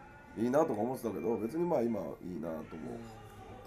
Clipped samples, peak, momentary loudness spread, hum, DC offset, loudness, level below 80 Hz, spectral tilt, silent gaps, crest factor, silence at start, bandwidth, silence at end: under 0.1%; -16 dBFS; 17 LU; none; under 0.1%; -35 LUFS; -62 dBFS; -7.5 dB/octave; none; 20 dB; 0 s; 15.5 kHz; 0 s